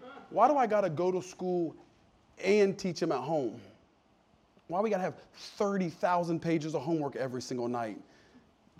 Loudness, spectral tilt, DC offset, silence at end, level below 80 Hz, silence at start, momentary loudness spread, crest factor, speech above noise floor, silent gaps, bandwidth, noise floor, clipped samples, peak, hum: -31 LUFS; -6 dB/octave; under 0.1%; 0.8 s; -74 dBFS; 0 s; 12 LU; 20 dB; 36 dB; none; 13 kHz; -66 dBFS; under 0.1%; -12 dBFS; none